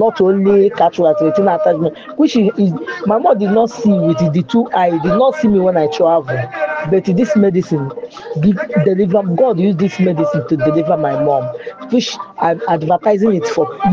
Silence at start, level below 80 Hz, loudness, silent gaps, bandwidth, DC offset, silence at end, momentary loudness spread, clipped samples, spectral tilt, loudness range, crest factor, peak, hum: 0 s; -52 dBFS; -14 LUFS; none; 7.2 kHz; under 0.1%; 0 s; 6 LU; under 0.1%; -7.5 dB/octave; 2 LU; 12 dB; 0 dBFS; none